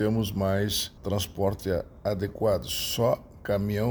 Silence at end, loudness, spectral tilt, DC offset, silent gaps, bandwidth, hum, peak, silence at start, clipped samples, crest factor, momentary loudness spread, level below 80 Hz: 0 s; -28 LUFS; -5 dB/octave; under 0.1%; none; over 20 kHz; none; -12 dBFS; 0 s; under 0.1%; 16 dB; 5 LU; -48 dBFS